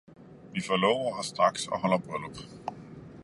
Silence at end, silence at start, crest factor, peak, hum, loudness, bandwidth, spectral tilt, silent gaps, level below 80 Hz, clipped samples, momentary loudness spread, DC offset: 0 s; 0.2 s; 22 dB; -10 dBFS; none; -29 LUFS; 11.5 kHz; -4.5 dB/octave; none; -64 dBFS; under 0.1%; 16 LU; under 0.1%